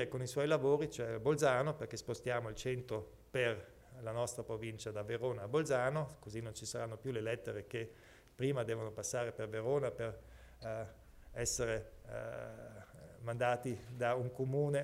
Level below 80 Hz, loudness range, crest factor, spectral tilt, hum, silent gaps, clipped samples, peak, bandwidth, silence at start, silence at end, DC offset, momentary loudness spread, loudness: -62 dBFS; 5 LU; 18 dB; -5 dB/octave; none; none; under 0.1%; -20 dBFS; 16 kHz; 0 s; 0 s; under 0.1%; 14 LU; -39 LUFS